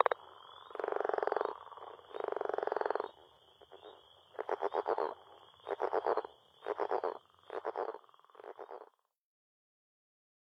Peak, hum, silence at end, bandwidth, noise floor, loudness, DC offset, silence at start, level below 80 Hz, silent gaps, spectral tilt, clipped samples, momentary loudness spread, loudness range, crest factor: -8 dBFS; none; 1.55 s; 6.6 kHz; -63 dBFS; -38 LUFS; under 0.1%; 0 s; -86 dBFS; none; -5 dB/octave; under 0.1%; 19 LU; 5 LU; 30 dB